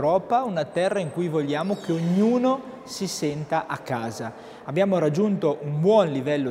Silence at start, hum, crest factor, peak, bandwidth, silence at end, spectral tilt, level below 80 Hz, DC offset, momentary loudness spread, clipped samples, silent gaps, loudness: 0 s; none; 16 dB; -8 dBFS; 16 kHz; 0 s; -6.5 dB/octave; -66 dBFS; under 0.1%; 9 LU; under 0.1%; none; -24 LUFS